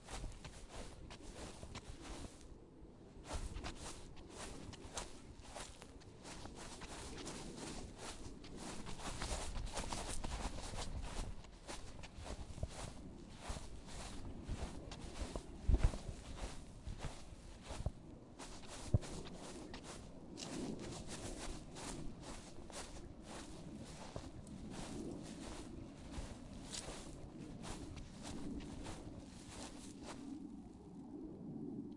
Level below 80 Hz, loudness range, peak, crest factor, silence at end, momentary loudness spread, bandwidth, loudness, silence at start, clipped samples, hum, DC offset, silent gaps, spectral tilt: -50 dBFS; 6 LU; -20 dBFS; 28 dB; 0 s; 9 LU; 11.5 kHz; -49 LUFS; 0 s; under 0.1%; none; under 0.1%; none; -4.5 dB/octave